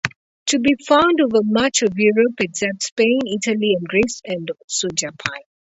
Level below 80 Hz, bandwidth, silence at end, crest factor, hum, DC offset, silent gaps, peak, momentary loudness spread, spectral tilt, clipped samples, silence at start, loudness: -54 dBFS; 8.2 kHz; 0.35 s; 18 dB; none; under 0.1%; 0.16-0.46 s, 2.92-2.96 s, 4.64-4.68 s; 0 dBFS; 11 LU; -3.5 dB/octave; under 0.1%; 0.05 s; -18 LUFS